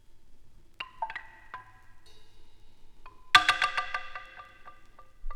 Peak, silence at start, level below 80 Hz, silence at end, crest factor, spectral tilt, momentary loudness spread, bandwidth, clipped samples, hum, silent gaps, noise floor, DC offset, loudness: -2 dBFS; 0.1 s; -50 dBFS; 0 s; 30 dB; 0 dB/octave; 27 LU; 19 kHz; under 0.1%; none; none; -50 dBFS; under 0.1%; -26 LUFS